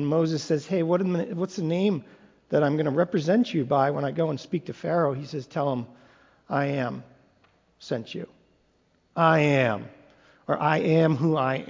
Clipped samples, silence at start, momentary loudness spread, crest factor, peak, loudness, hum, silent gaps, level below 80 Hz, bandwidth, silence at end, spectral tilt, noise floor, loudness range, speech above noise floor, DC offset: under 0.1%; 0 s; 12 LU; 20 dB; -6 dBFS; -25 LUFS; none; none; -66 dBFS; 7.6 kHz; 0 s; -7 dB/octave; -66 dBFS; 7 LU; 42 dB; under 0.1%